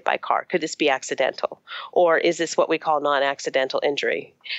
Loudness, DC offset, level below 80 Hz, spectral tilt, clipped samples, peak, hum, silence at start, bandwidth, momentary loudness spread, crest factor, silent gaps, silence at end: -22 LUFS; under 0.1%; -80 dBFS; -3 dB/octave; under 0.1%; -6 dBFS; none; 0.05 s; 8.4 kHz; 7 LU; 18 dB; none; 0 s